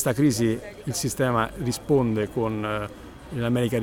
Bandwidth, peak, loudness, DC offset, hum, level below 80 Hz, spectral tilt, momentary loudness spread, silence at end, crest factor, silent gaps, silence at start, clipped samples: 17.5 kHz; -8 dBFS; -25 LUFS; under 0.1%; none; -48 dBFS; -5.5 dB/octave; 10 LU; 0 s; 16 dB; none; 0 s; under 0.1%